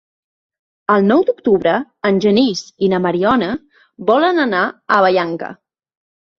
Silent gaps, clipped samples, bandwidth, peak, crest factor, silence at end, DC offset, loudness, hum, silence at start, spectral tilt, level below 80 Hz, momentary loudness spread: none; under 0.1%; 7.4 kHz; -2 dBFS; 14 dB; 0.85 s; under 0.1%; -15 LUFS; none; 0.9 s; -6 dB/octave; -56 dBFS; 10 LU